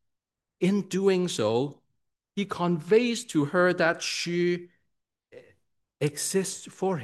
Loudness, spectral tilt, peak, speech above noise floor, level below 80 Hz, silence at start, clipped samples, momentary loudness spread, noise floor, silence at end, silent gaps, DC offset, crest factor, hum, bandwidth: -27 LUFS; -5 dB/octave; -8 dBFS; 59 dB; -74 dBFS; 0.6 s; under 0.1%; 10 LU; -85 dBFS; 0 s; none; under 0.1%; 18 dB; none; 12.5 kHz